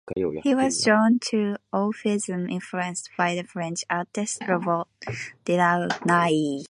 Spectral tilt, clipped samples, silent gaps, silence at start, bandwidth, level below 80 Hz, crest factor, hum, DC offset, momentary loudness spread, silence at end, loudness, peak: -4.5 dB/octave; under 0.1%; none; 0.05 s; 11.5 kHz; -62 dBFS; 18 dB; none; under 0.1%; 10 LU; 0.05 s; -24 LUFS; -6 dBFS